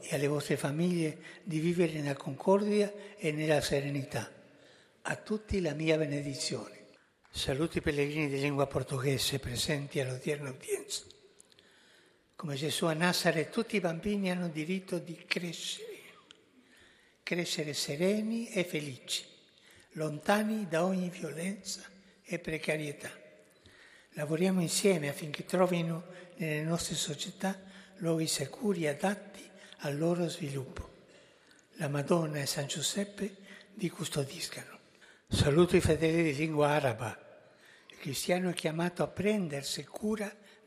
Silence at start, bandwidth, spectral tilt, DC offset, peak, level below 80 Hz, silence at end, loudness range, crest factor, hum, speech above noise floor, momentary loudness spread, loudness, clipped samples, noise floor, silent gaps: 0 s; 15 kHz; -5 dB/octave; under 0.1%; -10 dBFS; -58 dBFS; 0.3 s; 6 LU; 24 dB; none; 32 dB; 13 LU; -33 LUFS; under 0.1%; -64 dBFS; none